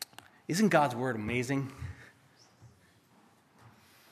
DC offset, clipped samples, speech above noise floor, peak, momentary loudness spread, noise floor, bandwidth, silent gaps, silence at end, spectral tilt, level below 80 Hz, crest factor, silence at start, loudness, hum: under 0.1%; under 0.1%; 34 dB; -10 dBFS; 20 LU; -64 dBFS; 15 kHz; none; 0.45 s; -5.5 dB/octave; -62 dBFS; 24 dB; 0 s; -30 LUFS; none